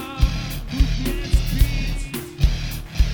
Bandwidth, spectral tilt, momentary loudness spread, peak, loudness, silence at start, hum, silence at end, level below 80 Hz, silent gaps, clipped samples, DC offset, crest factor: over 20 kHz; -5.5 dB/octave; 7 LU; -2 dBFS; -24 LUFS; 0 s; none; 0 s; -22 dBFS; none; under 0.1%; under 0.1%; 18 dB